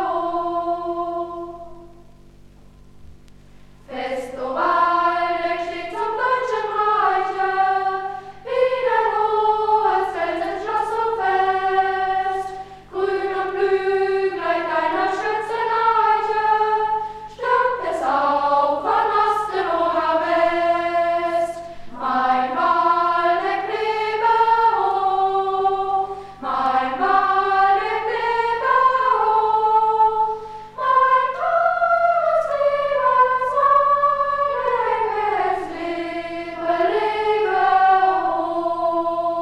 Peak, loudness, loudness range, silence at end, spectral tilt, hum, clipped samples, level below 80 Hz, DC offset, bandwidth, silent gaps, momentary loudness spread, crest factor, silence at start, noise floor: -6 dBFS; -19 LUFS; 4 LU; 0 s; -4.5 dB/octave; 50 Hz at -55 dBFS; under 0.1%; -52 dBFS; under 0.1%; 11.5 kHz; none; 10 LU; 14 dB; 0 s; -45 dBFS